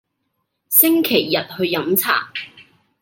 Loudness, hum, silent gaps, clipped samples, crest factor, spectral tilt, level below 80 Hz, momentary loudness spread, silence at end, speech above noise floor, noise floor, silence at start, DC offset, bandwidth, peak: -16 LUFS; none; none; under 0.1%; 20 dB; -3 dB/octave; -68 dBFS; 17 LU; 0.4 s; 55 dB; -73 dBFS; 0.7 s; under 0.1%; 17 kHz; 0 dBFS